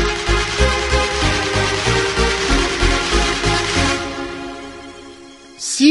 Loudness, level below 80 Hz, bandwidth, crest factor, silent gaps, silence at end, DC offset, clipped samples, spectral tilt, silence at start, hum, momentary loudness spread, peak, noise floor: -17 LUFS; -24 dBFS; 11.5 kHz; 18 dB; none; 0 s; under 0.1%; under 0.1%; -3.5 dB/octave; 0 s; none; 16 LU; 0 dBFS; -39 dBFS